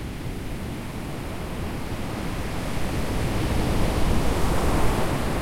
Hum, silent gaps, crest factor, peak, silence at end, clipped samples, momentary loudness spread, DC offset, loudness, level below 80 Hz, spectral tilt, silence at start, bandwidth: none; none; 14 dB; -10 dBFS; 0 s; under 0.1%; 9 LU; under 0.1%; -27 LUFS; -30 dBFS; -5.5 dB/octave; 0 s; 16.5 kHz